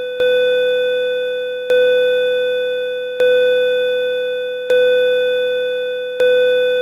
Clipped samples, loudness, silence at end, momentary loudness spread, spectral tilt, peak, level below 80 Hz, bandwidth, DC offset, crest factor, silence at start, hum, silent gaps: under 0.1%; -16 LUFS; 0 s; 8 LU; -2.5 dB/octave; -6 dBFS; -60 dBFS; 13.5 kHz; under 0.1%; 10 dB; 0 s; none; none